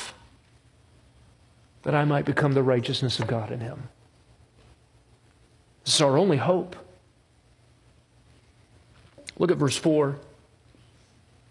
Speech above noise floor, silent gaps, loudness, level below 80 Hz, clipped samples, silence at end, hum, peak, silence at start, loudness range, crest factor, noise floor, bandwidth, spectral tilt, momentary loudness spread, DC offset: 37 dB; none; -24 LUFS; -62 dBFS; under 0.1%; 1.3 s; none; -8 dBFS; 0 s; 4 LU; 22 dB; -60 dBFS; 11.5 kHz; -5 dB/octave; 19 LU; under 0.1%